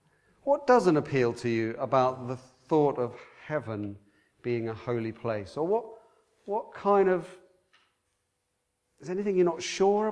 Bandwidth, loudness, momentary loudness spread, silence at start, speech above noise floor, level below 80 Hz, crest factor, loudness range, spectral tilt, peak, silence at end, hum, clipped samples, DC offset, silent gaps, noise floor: 10.5 kHz; -28 LUFS; 15 LU; 0.45 s; 51 dB; -68 dBFS; 20 dB; 7 LU; -6.5 dB/octave; -10 dBFS; 0 s; none; under 0.1%; under 0.1%; none; -79 dBFS